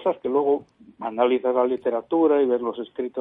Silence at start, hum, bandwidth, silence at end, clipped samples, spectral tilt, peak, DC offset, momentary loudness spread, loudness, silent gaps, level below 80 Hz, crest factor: 0 s; none; 3.9 kHz; 0 s; under 0.1%; -8.5 dB/octave; -8 dBFS; under 0.1%; 11 LU; -23 LUFS; none; -70 dBFS; 14 dB